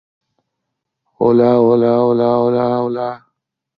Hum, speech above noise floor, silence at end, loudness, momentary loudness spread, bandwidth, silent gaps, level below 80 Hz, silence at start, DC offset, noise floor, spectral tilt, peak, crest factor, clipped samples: none; 63 dB; 0.6 s; -14 LUFS; 9 LU; 5.2 kHz; none; -58 dBFS; 1.2 s; under 0.1%; -77 dBFS; -10.5 dB/octave; -2 dBFS; 14 dB; under 0.1%